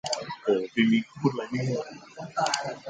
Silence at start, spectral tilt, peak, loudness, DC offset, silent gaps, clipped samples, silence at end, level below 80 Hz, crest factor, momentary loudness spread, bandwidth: 0.05 s; -5 dB/octave; -8 dBFS; -27 LUFS; under 0.1%; none; under 0.1%; 0 s; -68 dBFS; 20 dB; 11 LU; 9.4 kHz